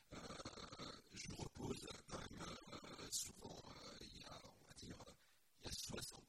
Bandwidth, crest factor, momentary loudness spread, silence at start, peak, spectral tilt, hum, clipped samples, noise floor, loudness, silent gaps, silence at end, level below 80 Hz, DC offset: 16 kHz; 24 dB; 11 LU; 0 s; -30 dBFS; -3 dB/octave; none; under 0.1%; -75 dBFS; -53 LUFS; none; 0 s; -68 dBFS; under 0.1%